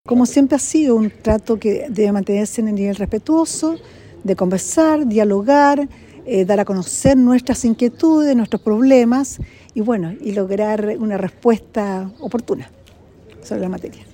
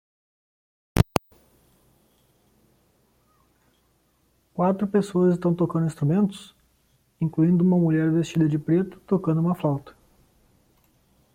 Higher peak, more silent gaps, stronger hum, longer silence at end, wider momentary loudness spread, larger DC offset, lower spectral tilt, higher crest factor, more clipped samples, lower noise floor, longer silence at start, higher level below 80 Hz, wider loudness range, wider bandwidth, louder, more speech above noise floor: about the same, 0 dBFS vs 0 dBFS; neither; neither; second, 0.15 s vs 1.45 s; first, 12 LU vs 9 LU; neither; second, -5.5 dB/octave vs -8 dB/octave; second, 16 dB vs 24 dB; neither; second, -45 dBFS vs -66 dBFS; second, 0.05 s vs 0.95 s; first, -42 dBFS vs -50 dBFS; second, 6 LU vs 10 LU; about the same, 16.5 kHz vs 16.5 kHz; first, -17 LUFS vs -23 LUFS; second, 29 dB vs 44 dB